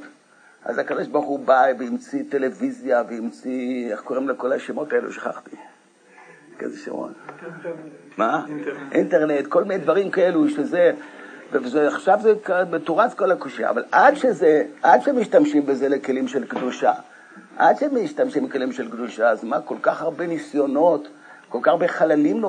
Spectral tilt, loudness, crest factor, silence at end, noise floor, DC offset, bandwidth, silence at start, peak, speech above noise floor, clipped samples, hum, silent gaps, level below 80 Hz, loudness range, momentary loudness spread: -6 dB/octave; -21 LUFS; 20 dB; 0 s; -53 dBFS; under 0.1%; 9.6 kHz; 0 s; -2 dBFS; 32 dB; under 0.1%; none; none; -82 dBFS; 10 LU; 14 LU